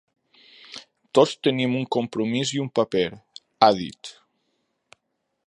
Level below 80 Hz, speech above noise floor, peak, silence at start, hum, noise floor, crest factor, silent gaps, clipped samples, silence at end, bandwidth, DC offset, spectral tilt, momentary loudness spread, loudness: -64 dBFS; 55 dB; -2 dBFS; 0.7 s; none; -77 dBFS; 24 dB; none; under 0.1%; 1.35 s; 11 kHz; under 0.1%; -5 dB/octave; 22 LU; -22 LUFS